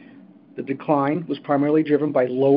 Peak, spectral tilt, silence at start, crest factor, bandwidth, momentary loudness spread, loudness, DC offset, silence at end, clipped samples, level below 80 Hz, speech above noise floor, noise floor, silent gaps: -4 dBFS; -12 dB/octave; 0.55 s; 16 dB; 5.2 kHz; 12 LU; -21 LUFS; under 0.1%; 0 s; under 0.1%; -74 dBFS; 27 dB; -47 dBFS; none